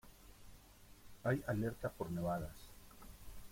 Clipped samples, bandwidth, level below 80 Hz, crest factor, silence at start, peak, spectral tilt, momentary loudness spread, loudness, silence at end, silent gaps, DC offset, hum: under 0.1%; 16.5 kHz; -60 dBFS; 20 dB; 0.05 s; -24 dBFS; -7 dB/octave; 24 LU; -41 LUFS; 0 s; none; under 0.1%; none